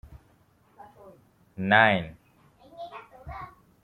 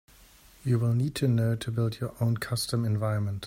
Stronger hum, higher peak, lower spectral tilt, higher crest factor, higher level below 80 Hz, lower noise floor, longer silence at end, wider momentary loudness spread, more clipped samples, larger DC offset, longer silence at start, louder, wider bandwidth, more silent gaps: neither; first, -6 dBFS vs -14 dBFS; about the same, -7 dB/octave vs -6.5 dB/octave; first, 24 dB vs 14 dB; about the same, -56 dBFS vs -58 dBFS; first, -62 dBFS vs -55 dBFS; first, 0.35 s vs 0 s; first, 26 LU vs 4 LU; neither; neither; first, 1.6 s vs 0.65 s; first, -22 LUFS vs -28 LUFS; second, 10.5 kHz vs 16 kHz; neither